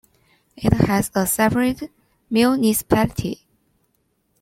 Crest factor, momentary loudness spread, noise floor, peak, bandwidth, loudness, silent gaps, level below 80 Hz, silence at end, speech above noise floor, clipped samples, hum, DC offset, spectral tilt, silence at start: 18 dB; 13 LU; -68 dBFS; -2 dBFS; 16.5 kHz; -19 LUFS; none; -42 dBFS; 1.05 s; 49 dB; under 0.1%; none; under 0.1%; -5 dB/octave; 0.6 s